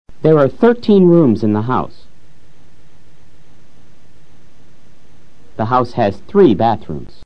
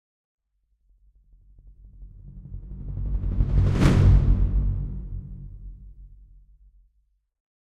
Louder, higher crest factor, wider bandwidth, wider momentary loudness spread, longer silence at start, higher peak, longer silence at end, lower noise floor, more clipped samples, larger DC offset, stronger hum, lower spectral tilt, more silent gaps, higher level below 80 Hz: first, -13 LUFS vs -23 LUFS; about the same, 16 dB vs 20 dB; second, 6.6 kHz vs 8.6 kHz; second, 13 LU vs 25 LU; second, 0.05 s vs 1.85 s; first, 0 dBFS vs -4 dBFS; second, 0 s vs 1.65 s; second, -50 dBFS vs -70 dBFS; first, 0.1% vs under 0.1%; first, 5% vs under 0.1%; neither; first, -9.5 dB/octave vs -8 dB/octave; neither; second, -48 dBFS vs -28 dBFS